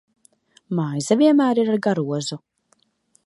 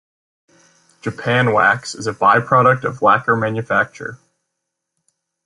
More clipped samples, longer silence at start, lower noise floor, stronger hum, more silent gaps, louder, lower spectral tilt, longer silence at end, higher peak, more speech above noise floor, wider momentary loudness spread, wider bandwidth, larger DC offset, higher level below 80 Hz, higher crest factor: neither; second, 0.7 s vs 1.05 s; second, -65 dBFS vs -78 dBFS; neither; neither; second, -20 LUFS vs -16 LUFS; about the same, -6 dB/octave vs -5.5 dB/octave; second, 0.9 s vs 1.3 s; about the same, -4 dBFS vs -2 dBFS; second, 46 dB vs 62 dB; about the same, 12 LU vs 14 LU; about the same, 11.5 kHz vs 11.5 kHz; neither; second, -72 dBFS vs -58 dBFS; about the same, 18 dB vs 16 dB